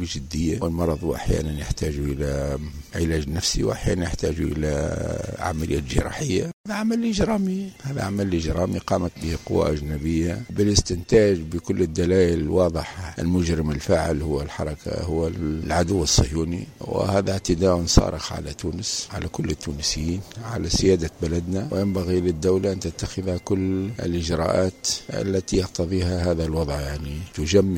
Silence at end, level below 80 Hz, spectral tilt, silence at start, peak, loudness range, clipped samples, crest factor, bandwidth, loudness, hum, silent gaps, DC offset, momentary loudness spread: 0 s; -34 dBFS; -5.5 dB/octave; 0 s; 0 dBFS; 4 LU; under 0.1%; 22 dB; 16.5 kHz; -24 LUFS; none; 6.53-6.64 s; under 0.1%; 9 LU